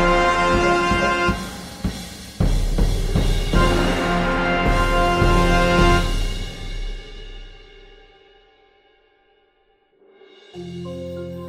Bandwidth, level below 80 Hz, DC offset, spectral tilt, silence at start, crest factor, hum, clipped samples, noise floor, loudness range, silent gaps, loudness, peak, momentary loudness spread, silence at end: 15 kHz; -26 dBFS; under 0.1%; -5.5 dB/octave; 0 s; 18 dB; none; under 0.1%; -61 dBFS; 20 LU; none; -20 LUFS; -2 dBFS; 18 LU; 0 s